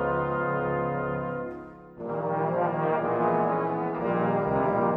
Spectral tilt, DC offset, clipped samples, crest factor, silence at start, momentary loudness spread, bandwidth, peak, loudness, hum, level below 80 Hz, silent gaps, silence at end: -10.5 dB/octave; under 0.1%; under 0.1%; 14 dB; 0 s; 10 LU; 5 kHz; -12 dBFS; -27 LUFS; none; -54 dBFS; none; 0 s